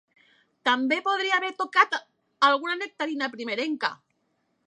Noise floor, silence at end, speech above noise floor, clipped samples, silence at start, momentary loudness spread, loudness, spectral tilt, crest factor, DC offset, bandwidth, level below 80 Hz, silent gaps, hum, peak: -73 dBFS; 0.75 s; 48 dB; under 0.1%; 0.65 s; 8 LU; -25 LUFS; -2 dB/octave; 22 dB; under 0.1%; 10.5 kHz; -88 dBFS; none; none; -6 dBFS